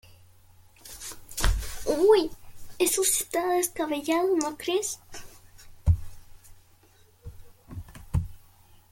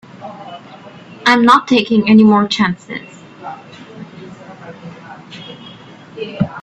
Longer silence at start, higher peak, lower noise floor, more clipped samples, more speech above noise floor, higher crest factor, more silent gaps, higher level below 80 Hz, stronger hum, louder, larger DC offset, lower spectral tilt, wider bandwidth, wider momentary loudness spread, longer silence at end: first, 0.85 s vs 0.2 s; second, -8 dBFS vs 0 dBFS; first, -58 dBFS vs -37 dBFS; neither; first, 33 dB vs 26 dB; about the same, 20 dB vs 16 dB; neither; first, -38 dBFS vs -54 dBFS; neither; second, -26 LUFS vs -12 LUFS; neither; about the same, -4.5 dB/octave vs -5.5 dB/octave; first, 17 kHz vs 8.4 kHz; second, 22 LU vs 26 LU; first, 0.55 s vs 0 s